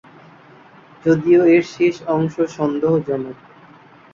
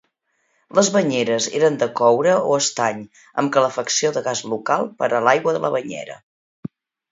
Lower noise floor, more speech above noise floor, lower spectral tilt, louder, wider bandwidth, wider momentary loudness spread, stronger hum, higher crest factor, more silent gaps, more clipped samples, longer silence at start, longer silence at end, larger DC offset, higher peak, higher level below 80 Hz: second, -46 dBFS vs -68 dBFS; second, 29 dB vs 49 dB; first, -7.5 dB/octave vs -3.5 dB/octave; about the same, -17 LUFS vs -19 LUFS; about the same, 7.4 kHz vs 7.8 kHz; second, 12 LU vs 16 LU; neither; about the same, 16 dB vs 20 dB; second, none vs 6.23-6.63 s; neither; first, 1.05 s vs 0.75 s; first, 0.8 s vs 0.45 s; neither; second, -4 dBFS vs 0 dBFS; first, -58 dBFS vs -68 dBFS